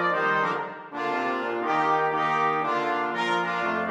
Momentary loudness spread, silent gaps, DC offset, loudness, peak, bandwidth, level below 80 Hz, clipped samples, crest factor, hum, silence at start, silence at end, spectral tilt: 5 LU; none; under 0.1%; -25 LUFS; -12 dBFS; 12.5 kHz; -74 dBFS; under 0.1%; 14 dB; none; 0 s; 0 s; -5 dB/octave